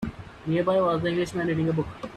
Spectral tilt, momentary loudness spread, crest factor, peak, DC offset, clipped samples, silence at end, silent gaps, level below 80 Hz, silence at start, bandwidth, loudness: -7 dB/octave; 9 LU; 14 dB; -12 dBFS; under 0.1%; under 0.1%; 0 s; none; -50 dBFS; 0 s; 12.5 kHz; -25 LUFS